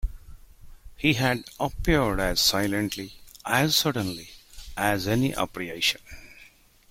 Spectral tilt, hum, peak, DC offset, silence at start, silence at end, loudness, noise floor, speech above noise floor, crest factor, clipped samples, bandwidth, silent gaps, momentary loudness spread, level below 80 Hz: -4 dB/octave; none; -8 dBFS; under 0.1%; 0 s; 0.45 s; -25 LUFS; -54 dBFS; 29 dB; 20 dB; under 0.1%; 16.5 kHz; none; 18 LU; -40 dBFS